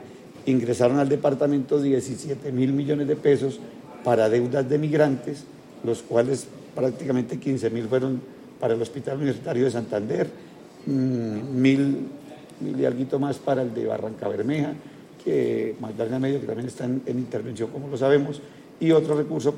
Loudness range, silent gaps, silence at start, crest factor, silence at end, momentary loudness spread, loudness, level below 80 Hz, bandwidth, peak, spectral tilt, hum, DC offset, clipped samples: 4 LU; none; 0 s; 20 dB; 0 s; 12 LU; -25 LUFS; -68 dBFS; 12 kHz; -4 dBFS; -7 dB/octave; none; under 0.1%; under 0.1%